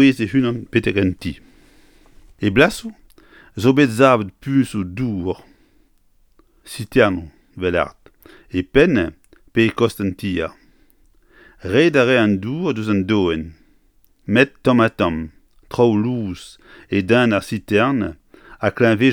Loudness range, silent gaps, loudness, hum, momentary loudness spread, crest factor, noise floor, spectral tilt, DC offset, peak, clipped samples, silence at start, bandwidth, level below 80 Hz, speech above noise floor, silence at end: 4 LU; none; -18 LUFS; none; 15 LU; 18 dB; -56 dBFS; -6.5 dB/octave; under 0.1%; 0 dBFS; under 0.1%; 0 s; 17.5 kHz; -44 dBFS; 39 dB; 0 s